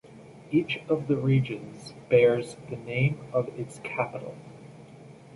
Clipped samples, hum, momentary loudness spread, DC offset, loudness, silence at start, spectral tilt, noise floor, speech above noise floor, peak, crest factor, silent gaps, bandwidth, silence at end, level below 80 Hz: under 0.1%; none; 22 LU; under 0.1%; -27 LUFS; 0.05 s; -7.5 dB/octave; -48 dBFS; 22 dB; -8 dBFS; 20 dB; none; 11.5 kHz; 0.25 s; -62 dBFS